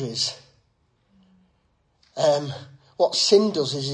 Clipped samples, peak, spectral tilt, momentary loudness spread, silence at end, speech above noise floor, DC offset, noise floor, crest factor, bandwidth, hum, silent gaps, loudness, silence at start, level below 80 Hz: under 0.1%; -6 dBFS; -4 dB/octave; 22 LU; 0 s; 45 dB; under 0.1%; -67 dBFS; 20 dB; 11 kHz; none; none; -21 LUFS; 0 s; -68 dBFS